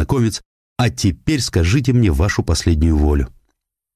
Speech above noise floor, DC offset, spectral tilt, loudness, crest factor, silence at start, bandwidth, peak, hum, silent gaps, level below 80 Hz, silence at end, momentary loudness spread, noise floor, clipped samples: 55 dB; under 0.1%; -6 dB/octave; -17 LUFS; 14 dB; 0 s; 15 kHz; -4 dBFS; none; 0.45-0.76 s; -22 dBFS; 0.65 s; 6 LU; -71 dBFS; under 0.1%